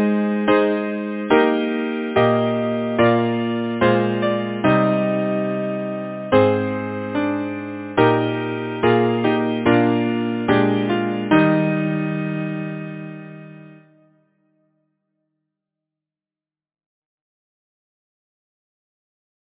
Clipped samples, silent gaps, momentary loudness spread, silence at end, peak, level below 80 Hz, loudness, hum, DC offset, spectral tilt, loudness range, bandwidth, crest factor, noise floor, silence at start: under 0.1%; none; 10 LU; 5.65 s; 0 dBFS; -54 dBFS; -19 LUFS; none; under 0.1%; -11 dB/octave; 7 LU; 4 kHz; 20 dB; under -90 dBFS; 0 s